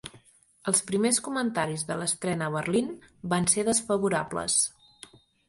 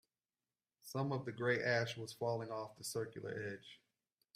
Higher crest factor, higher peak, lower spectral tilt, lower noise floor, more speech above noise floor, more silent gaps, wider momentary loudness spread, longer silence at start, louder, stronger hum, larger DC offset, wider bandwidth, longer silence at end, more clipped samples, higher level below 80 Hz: about the same, 22 dB vs 20 dB; first, -8 dBFS vs -22 dBFS; second, -3.5 dB/octave vs -5 dB/octave; second, -58 dBFS vs under -90 dBFS; second, 31 dB vs over 49 dB; neither; second, 6 LU vs 12 LU; second, 0.05 s vs 0.85 s; first, -27 LUFS vs -41 LUFS; neither; neither; second, 12 kHz vs 15.5 kHz; first, 0.8 s vs 0.6 s; neither; first, -62 dBFS vs -80 dBFS